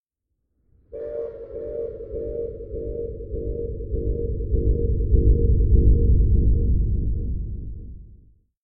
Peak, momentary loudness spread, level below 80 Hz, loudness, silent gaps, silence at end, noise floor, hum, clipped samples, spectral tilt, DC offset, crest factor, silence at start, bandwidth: -6 dBFS; 15 LU; -24 dBFS; -24 LUFS; none; 0.55 s; -77 dBFS; none; under 0.1%; -15.5 dB/octave; under 0.1%; 16 dB; 0.9 s; 1.2 kHz